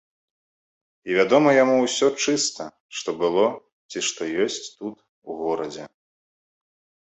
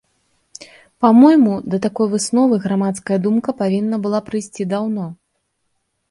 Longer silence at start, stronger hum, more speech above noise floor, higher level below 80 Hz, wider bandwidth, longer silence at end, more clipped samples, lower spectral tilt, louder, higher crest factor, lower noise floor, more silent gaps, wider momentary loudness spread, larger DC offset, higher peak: first, 1.05 s vs 0.6 s; neither; first, over 68 dB vs 54 dB; second, -70 dBFS vs -60 dBFS; second, 8.4 kHz vs 11.5 kHz; first, 1.15 s vs 0.95 s; neither; second, -3 dB/octave vs -6.5 dB/octave; second, -22 LUFS vs -16 LUFS; about the same, 20 dB vs 16 dB; first, under -90 dBFS vs -70 dBFS; first, 2.81-2.89 s, 3.72-3.89 s, 5.09-5.22 s vs none; first, 19 LU vs 13 LU; neither; second, -4 dBFS vs 0 dBFS